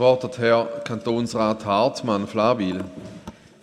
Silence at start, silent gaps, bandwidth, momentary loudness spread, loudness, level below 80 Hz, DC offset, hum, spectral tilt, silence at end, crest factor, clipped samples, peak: 0 s; none; 11.5 kHz; 18 LU; -22 LUFS; -58 dBFS; under 0.1%; none; -6 dB/octave; 0.3 s; 18 dB; under 0.1%; -6 dBFS